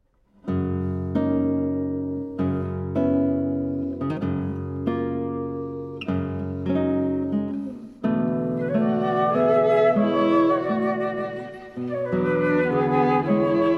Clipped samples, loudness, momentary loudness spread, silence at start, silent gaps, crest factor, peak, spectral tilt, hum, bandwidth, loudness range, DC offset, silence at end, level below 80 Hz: under 0.1%; -24 LUFS; 10 LU; 0.45 s; none; 14 dB; -8 dBFS; -9.5 dB/octave; none; 6.2 kHz; 6 LU; under 0.1%; 0 s; -60 dBFS